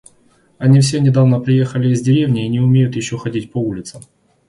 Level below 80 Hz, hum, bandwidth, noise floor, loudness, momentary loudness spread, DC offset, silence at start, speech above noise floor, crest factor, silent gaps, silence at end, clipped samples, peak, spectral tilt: -50 dBFS; none; 11.5 kHz; -54 dBFS; -15 LUFS; 10 LU; under 0.1%; 0.6 s; 40 dB; 14 dB; none; 0.5 s; under 0.1%; 0 dBFS; -7 dB/octave